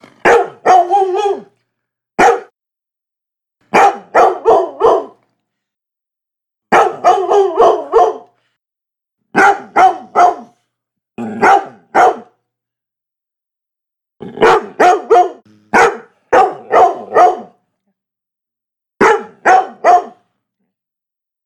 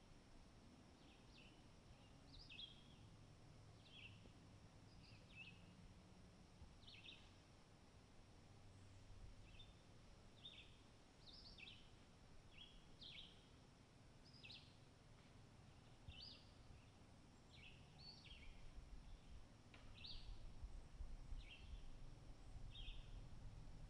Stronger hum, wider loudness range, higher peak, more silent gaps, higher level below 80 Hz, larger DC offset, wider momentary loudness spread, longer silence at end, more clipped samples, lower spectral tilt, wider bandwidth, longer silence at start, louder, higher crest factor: neither; about the same, 4 LU vs 4 LU; first, 0 dBFS vs -42 dBFS; neither; first, -52 dBFS vs -64 dBFS; neither; about the same, 8 LU vs 9 LU; first, 1.35 s vs 0 s; neither; about the same, -4 dB/octave vs -4.5 dB/octave; first, 12.5 kHz vs 10.5 kHz; first, 0.25 s vs 0 s; first, -11 LUFS vs -64 LUFS; second, 14 dB vs 20 dB